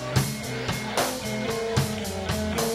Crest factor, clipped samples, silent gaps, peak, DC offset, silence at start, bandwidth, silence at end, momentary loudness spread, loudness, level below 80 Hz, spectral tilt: 18 dB; under 0.1%; none; -8 dBFS; under 0.1%; 0 s; 16 kHz; 0 s; 3 LU; -27 LUFS; -44 dBFS; -4.5 dB/octave